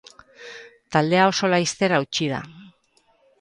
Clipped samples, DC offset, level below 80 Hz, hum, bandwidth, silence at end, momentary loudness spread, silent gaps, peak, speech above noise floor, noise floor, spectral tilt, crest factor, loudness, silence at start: under 0.1%; under 0.1%; -64 dBFS; none; 11.5 kHz; 0.75 s; 23 LU; none; -4 dBFS; 42 dB; -63 dBFS; -4.5 dB/octave; 18 dB; -21 LUFS; 0.4 s